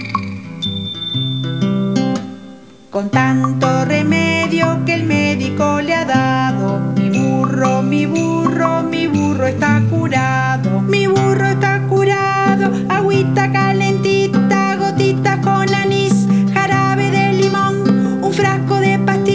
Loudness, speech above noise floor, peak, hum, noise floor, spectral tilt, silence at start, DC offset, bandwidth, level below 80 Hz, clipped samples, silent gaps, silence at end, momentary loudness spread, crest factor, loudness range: -15 LUFS; 23 dB; 0 dBFS; none; -37 dBFS; -6.5 dB/octave; 0 s; 0.4%; 8 kHz; -46 dBFS; under 0.1%; none; 0 s; 5 LU; 14 dB; 2 LU